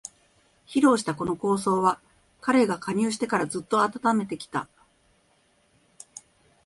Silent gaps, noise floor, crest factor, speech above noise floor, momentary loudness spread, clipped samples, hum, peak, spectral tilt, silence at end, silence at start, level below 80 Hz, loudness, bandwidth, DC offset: none; -65 dBFS; 20 dB; 41 dB; 22 LU; under 0.1%; none; -6 dBFS; -5 dB/octave; 2 s; 0.7 s; -64 dBFS; -25 LUFS; 11.5 kHz; under 0.1%